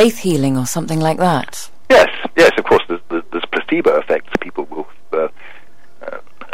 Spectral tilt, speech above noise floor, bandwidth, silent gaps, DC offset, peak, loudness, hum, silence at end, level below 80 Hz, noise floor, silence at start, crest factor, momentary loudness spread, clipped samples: -5 dB/octave; 32 dB; 16 kHz; none; 4%; -2 dBFS; -16 LUFS; none; 0.1 s; -50 dBFS; -47 dBFS; 0 s; 14 dB; 19 LU; under 0.1%